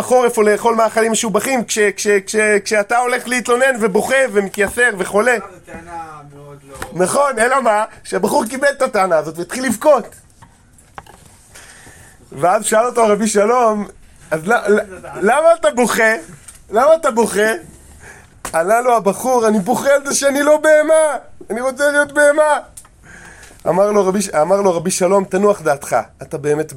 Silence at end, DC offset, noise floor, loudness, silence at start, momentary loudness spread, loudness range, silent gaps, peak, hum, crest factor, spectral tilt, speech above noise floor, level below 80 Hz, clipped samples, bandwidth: 0 s; under 0.1%; -47 dBFS; -15 LUFS; 0 s; 10 LU; 4 LU; none; -2 dBFS; none; 14 dB; -3.5 dB/octave; 33 dB; -50 dBFS; under 0.1%; 17 kHz